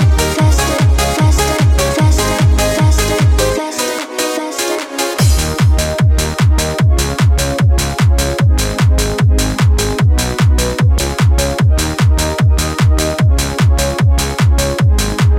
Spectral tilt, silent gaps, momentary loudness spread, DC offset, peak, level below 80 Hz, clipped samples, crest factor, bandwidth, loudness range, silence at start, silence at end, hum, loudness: -5 dB/octave; none; 2 LU; under 0.1%; -2 dBFS; -16 dBFS; under 0.1%; 10 dB; 16.5 kHz; 2 LU; 0 s; 0 s; none; -13 LUFS